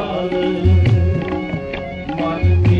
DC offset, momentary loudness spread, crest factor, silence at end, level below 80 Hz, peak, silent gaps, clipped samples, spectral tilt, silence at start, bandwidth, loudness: under 0.1%; 11 LU; 12 dB; 0 s; -32 dBFS; -4 dBFS; none; under 0.1%; -9 dB/octave; 0 s; 6 kHz; -18 LUFS